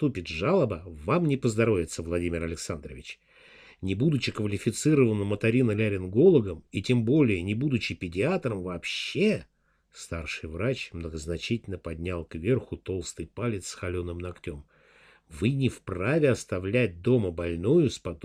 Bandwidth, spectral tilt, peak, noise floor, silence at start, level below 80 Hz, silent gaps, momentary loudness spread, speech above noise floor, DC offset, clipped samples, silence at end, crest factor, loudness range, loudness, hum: 14 kHz; -6.5 dB/octave; -10 dBFS; -58 dBFS; 0 s; -50 dBFS; none; 13 LU; 31 dB; under 0.1%; under 0.1%; 0.1 s; 18 dB; 8 LU; -27 LUFS; none